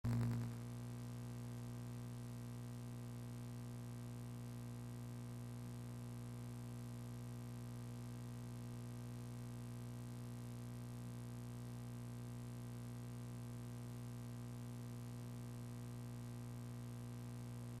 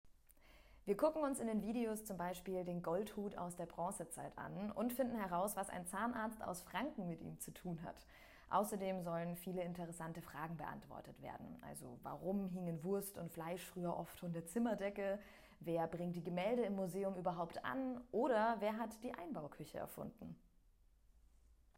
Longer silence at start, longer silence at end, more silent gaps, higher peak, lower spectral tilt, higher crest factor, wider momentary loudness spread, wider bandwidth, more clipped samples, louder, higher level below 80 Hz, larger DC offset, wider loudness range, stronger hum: about the same, 0.05 s vs 0.05 s; second, 0 s vs 1.4 s; neither; second, -32 dBFS vs -22 dBFS; about the same, -7 dB/octave vs -6 dB/octave; about the same, 18 dB vs 22 dB; second, 1 LU vs 13 LU; about the same, 15 kHz vs 16 kHz; neither; second, -50 LUFS vs -44 LUFS; about the same, -66 dBFS vs -68 dBFS; neither; second, 0 LU vs 6 LU; first, 60 Hz at -50 dBFS vs none